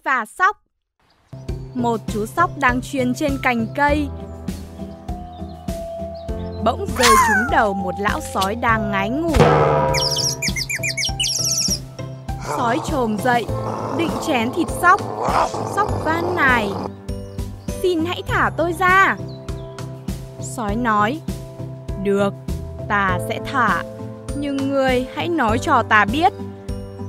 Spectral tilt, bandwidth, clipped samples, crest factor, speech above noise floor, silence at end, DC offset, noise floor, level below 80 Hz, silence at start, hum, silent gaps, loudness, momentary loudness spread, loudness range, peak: -4 dB/octave; 16 kHz; under 0.1%; 20 dB; 44 dB; 0 s; under 0.1%; -63 dBFS; -36 dBFS; 0.05 s; none; none; -19 LUFS; 16 LU; 5 LU; 0 dBFS